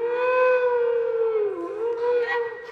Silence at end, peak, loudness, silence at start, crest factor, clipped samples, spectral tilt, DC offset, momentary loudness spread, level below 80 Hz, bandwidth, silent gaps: 0 s; -12 dBFS; -23 LUFS; 0 s; 12 dB; under 0.1%; -5 dB/octave; under 0.1%; 8 LU; -70 dBFS; 5.4 kHz; none